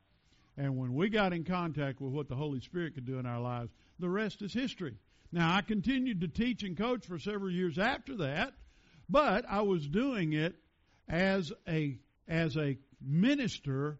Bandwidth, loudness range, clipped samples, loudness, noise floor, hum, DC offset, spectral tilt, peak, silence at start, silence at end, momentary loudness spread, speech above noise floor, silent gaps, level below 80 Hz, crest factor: 7.6 kHz; 4 LU; under 0.1%; -34 LUFS; -68 dBFS; none; under 0.1%; -5 dB/octave; -14 dBFS; 0.55 s; 0 s; 9 LU; 35 dB; none; -58 dBFS; 20 dB